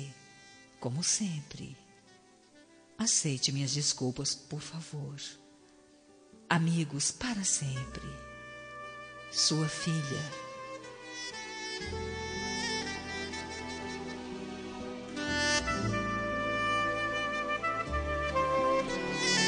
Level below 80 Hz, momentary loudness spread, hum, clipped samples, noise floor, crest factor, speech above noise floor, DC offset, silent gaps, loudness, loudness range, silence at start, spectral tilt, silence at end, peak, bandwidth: -52 dBFS; 16 LU; none; under 0.1%; -60 dBFS; 24 dB; 27 dB; under 0.1%; none; -32 LUFS; 6 LU; 0 s; -3 dB/octave; 0 s; -10 dBFS; 10 kHz